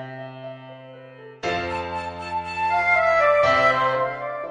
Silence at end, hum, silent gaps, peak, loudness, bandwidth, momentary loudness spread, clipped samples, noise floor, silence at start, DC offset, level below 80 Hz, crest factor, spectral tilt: 0 s; none; none; -8 dBFS; -21 LUFS; 9.8 kHz; 21 LU; under 0.1%; -43 dBFS; 0 s; under 0.1%; -54 dBFS; 16 dB; -4.5 dB/octave